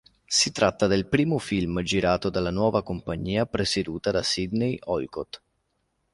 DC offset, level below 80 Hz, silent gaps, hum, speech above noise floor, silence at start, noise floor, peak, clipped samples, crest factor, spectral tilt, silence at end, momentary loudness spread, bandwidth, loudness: under 0.1%; -48 dBFS; none; none; 49 dB; 0.3 s; -74 dBFS; -6 dBFS; under 0.1%; 20 dB; -4.5 dB/octave; 0.75 s; 8 LU; 11.5 kHz; -25 LUFS